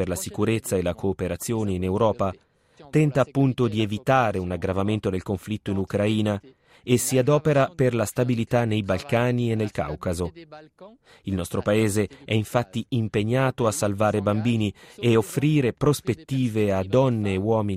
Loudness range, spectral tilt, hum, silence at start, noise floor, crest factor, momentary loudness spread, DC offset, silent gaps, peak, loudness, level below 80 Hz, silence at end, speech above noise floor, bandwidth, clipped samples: 4 LU; -6 dB/octave; none; 0 s; -49 dBFS; 18 dB; 7 LU; under 0.1%; none; -6 dBFS; -24 LUFS; -52 dBFS; 0 s; 26 dB; 15.5 kHz; under 0.1%